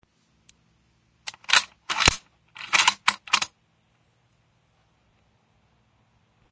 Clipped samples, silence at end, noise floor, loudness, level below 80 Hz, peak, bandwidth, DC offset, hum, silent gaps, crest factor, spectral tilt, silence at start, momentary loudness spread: under 0.1%; 3.05 s; -66 dBFS; -22 LUFS; -48 dBFS; -2 dBFS; 8 kHz; under 0.1%; none; none; 28 dB; -0.5 dB/octave; 1.25 s; 19 LU